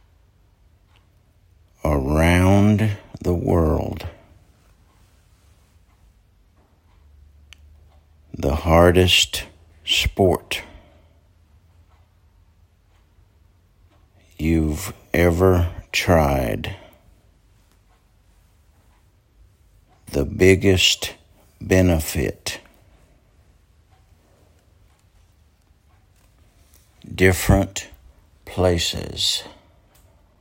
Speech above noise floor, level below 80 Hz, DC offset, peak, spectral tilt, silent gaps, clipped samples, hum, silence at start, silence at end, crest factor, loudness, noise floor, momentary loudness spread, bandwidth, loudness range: 39 dB; -38 dBFS; under 0.1%; 0 dBFS; -5 dB/octave; none; under 0.1%; none; 1.85 s; 0.9 s; 22 dB; -19 LUFS; -57 dBFS; 17 LU; 16.5 kHz; 11 LU